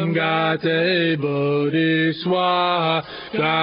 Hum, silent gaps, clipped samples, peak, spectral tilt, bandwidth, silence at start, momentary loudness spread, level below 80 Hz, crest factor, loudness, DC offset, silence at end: none; none; under 0.1%; -6 dBFS; -10.5 dB/octave; 5.4 kHz; 0 s; 3 LU; -64 dBFS; 14 dB; -20 LUFS; under 0.1%; 0 s